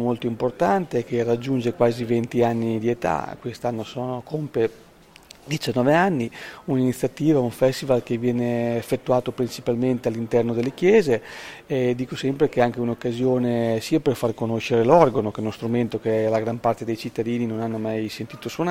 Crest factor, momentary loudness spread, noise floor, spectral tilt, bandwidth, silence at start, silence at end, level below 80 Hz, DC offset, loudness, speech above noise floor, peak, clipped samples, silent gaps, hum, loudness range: 22 dB; 10 LU; -48 dBFS; -7 dB/octave; 16 kHz; 0 s; 0 s; -56 dBFS; under 0.1%; -23 LUFS; 26 dB; 0 dBFS; under 0.1%; none; none; 4 LU